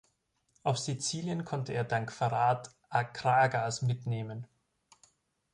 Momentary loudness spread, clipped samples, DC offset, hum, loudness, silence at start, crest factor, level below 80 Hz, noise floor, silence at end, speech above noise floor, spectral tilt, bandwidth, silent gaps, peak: 10 LU; under 0.1%; under 0.1%; none; -32 LUFS; 0.65 s; 20 dB; -68 dBFS; -76 dBFS; 1.1 s; 45 dB; -4.5 dB/octave; 11 kHz; none; -14 dBFS